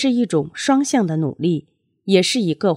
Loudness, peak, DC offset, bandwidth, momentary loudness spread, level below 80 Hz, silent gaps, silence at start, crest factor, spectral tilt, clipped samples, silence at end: -19 LUFS; -2 dBFS; under 0.1%; 14 kHz; 6 LU; -66 dBFS; none; 0 s; 18 dB; -5 dB/octave; under 0.1%; 0 s